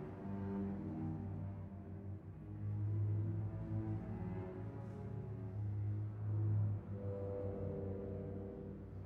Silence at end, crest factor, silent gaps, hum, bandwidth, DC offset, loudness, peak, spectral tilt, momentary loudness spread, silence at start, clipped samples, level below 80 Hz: 0 s; 14 dB; none; none; 2.9 kHz; under 0.1%; -44 LUFS; -28 dBFS; -11.5 dB/octave; 11 LU; 0 s; under 0.1%; -60 dBFS